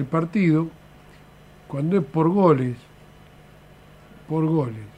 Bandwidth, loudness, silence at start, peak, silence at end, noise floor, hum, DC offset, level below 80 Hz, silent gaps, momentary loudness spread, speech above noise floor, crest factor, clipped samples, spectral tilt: 9 kHz; -22 LUFS; 0 s; -4 dBFS; 0.05 s; -48 dBFS; 50 Hz at -45 dBFS; under 0.1%; -56 dBFS; none; 12 LU; 28 dB; 20 dB; under 0.1%; -9.5 dB/octave